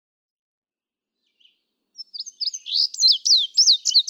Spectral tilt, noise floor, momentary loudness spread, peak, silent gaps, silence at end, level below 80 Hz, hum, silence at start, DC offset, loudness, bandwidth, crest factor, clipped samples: 9 dB/octave; under -90 dBFS; 20 LU; -6 dBFS; none; 0.1 s; under -90 dBFS; none; 2 s; under 0.1%; -16 LUFS; 18.5 kHz; 16 dB; under 0.1%